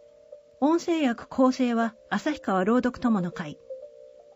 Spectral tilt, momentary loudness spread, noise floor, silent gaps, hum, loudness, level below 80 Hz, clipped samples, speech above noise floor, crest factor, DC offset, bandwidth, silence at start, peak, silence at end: -6 dB/octave; 15 LU; -51 dBFS; none; none; -26 LUFS; -60 dBFS; under 0.1%; 26 dB; 16 dB; under 0.1%; 8 kHz; 0.3 s; -12 dBFS; 0.3 s